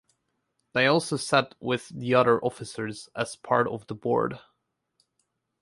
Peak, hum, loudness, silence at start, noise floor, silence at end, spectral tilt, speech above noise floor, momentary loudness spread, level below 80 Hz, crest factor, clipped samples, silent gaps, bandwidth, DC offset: -6 dBFS; none; -26 LUFS; 0.75 s; -77 dBFS; 1.2 s; -5 dB/octave; 51 dB; 12 LU; -66 dBFS; 22 dB; under 0.1%; none; 11.5 kHz; under 0.1%